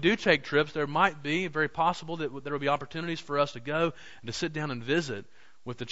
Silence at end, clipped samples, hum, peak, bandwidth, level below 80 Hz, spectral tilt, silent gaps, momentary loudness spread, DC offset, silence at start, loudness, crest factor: 0 s; under 0.1%; none; -8 dBFS; 8 kHz; -60 dBFS; -5 dB/octave; none; 13 LU; 0.5%; 0 s; -29 LUFS; 22 dB